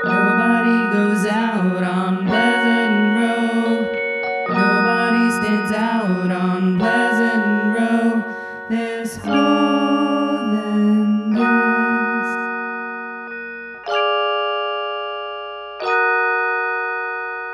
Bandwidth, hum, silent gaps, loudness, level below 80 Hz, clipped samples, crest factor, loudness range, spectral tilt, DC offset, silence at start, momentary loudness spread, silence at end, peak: 12.5 kHz; none; none; -18 LUFS; -60 dBFS; under 0.1%; 16 dB; 4 LU; -6 dB/octave; under 0.1%; 0 s; 10 LU; 0 s; -4 dBFS